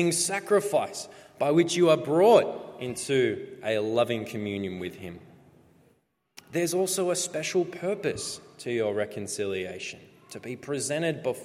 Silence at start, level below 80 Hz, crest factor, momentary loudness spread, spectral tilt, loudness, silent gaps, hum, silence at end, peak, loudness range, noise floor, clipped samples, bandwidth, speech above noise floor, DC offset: 0 s; -70 dBFS; 22 dB; 16 LU; -4 dB/octave; -27 LUFS; none; none; 0 s; -6 dBFS; 8 LU; -68 dBFS; under 0.1%; 15.5 kHz; 41 dB; under 0.1%